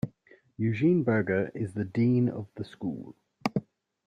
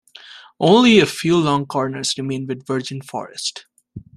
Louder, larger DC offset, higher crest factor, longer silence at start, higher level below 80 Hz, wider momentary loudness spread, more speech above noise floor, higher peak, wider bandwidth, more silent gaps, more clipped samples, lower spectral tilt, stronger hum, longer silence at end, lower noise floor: second, -29 LUFS vs -18 LUFS; neither; about the same, 18 dB vs 18 dB; second, 0.05 s vs 0.3 s; second, -64 dBFS vs -58 dBFS; about the same, 14 LU vs 14 LU; first, 32 dB vs 25 dB; second, -12 dBFS vs -2 dBFS; second, 10 kHz vs 13.5 kHz; neither; neither; first, -9 dB/octave vs -4.5 dB/octave; neither; first, 0.45 s vs 0.2 s; first, -60 dBFS vs -42 dBFS